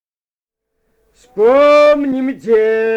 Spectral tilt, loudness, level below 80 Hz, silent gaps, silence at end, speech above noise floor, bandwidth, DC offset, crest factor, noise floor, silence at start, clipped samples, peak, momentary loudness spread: -5 dB/octave; -11 LUFS; -52 dBFS; none; 0 s; over 79 dB; 8.8 kHz; under 0.1%; 12 dB; under -90 dBFS; 1.35 s; under 0.1%; -2 dBFS; 10 LU